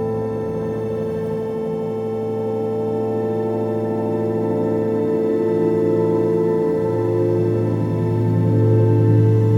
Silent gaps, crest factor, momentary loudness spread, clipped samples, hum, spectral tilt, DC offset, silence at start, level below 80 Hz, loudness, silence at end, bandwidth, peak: none; 14 dB; 8 LU; under 0.1%; none; -10.5 dB/octave; under 0.1%; 0 s; -50 dBFS; -20 LUFS; 0 s; 5.6 kHz; -6 dBFS